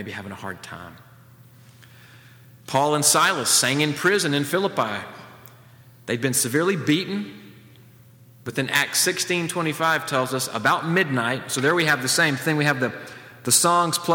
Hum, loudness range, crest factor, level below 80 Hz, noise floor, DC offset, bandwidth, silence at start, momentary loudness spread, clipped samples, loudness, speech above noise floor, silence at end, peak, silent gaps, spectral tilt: none; 5 LU; 18 dB; -68 dBFS; -50 dBFS; under 0.1%; over 20 kHz; 0 s; 17 LU; under 0.1%; -21 LUFS; 28 dB; 0 s; -4 dBFS; none; -3 dB/octave